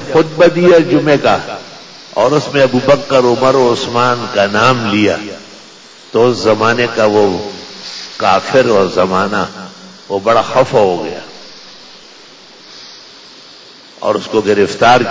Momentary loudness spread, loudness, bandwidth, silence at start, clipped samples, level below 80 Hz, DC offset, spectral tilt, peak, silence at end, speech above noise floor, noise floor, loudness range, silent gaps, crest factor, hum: 20 LU; -12 LUFS; 7.8 kHz; 0 s; under 0.1%; -46 dBFS; under 0.1%; -5 dB/octave; 0 dBFS; 0 s; 27 dB; -38 dBFS; 8 LU; none; 12 dB; none